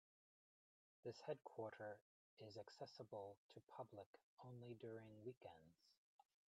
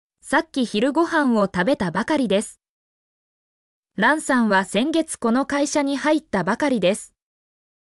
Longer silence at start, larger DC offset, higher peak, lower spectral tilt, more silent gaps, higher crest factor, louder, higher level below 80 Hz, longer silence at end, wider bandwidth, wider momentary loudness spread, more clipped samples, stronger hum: first, 1.05 s vs 0.25 s; neither; second, -38 dBFS vs -8 dBFS; first, -6.5 dB/octave vs -4.5 dB/octave; second, 2.02-2.37 s, 3.37-3.49 s, 3.63-3.67 s, 4.06-4.14 s, 4.23-4.37 s, 5.37-5.41 s vs 2.69-3.83 s; first, 22 dB vs 14 dB; second, -58 LUFS vs -21 LUFS; second, under -90 dBFS vs -56 dBFS; second, 0.55 s vs 0.85 s; second, 9 kHz vs 12 kHz; first, 11 LU vs 4 LU; neither; neither